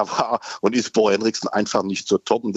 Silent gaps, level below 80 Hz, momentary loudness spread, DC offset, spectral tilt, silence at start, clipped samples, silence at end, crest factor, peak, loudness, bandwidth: none; -64 dBFS; 4 LU; under 0.1%; -4 dB/octave; 0 s; under 0.1%; 0 s; 16 dB; -4 dBFS; -21 LUFS; 8.2 kHz